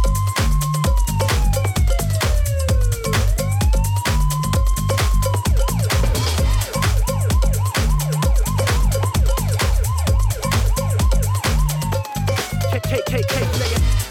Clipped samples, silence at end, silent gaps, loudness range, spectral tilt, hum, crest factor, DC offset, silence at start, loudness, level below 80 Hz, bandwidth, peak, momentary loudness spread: under 0.1%; 0 s; none; 1 LU; -5 dB/octave; none; 12 dB; under 0.1%; 0 s; -19 LUFS; -20 dBFS; 17 kHz; -6 dBFS; 2 LU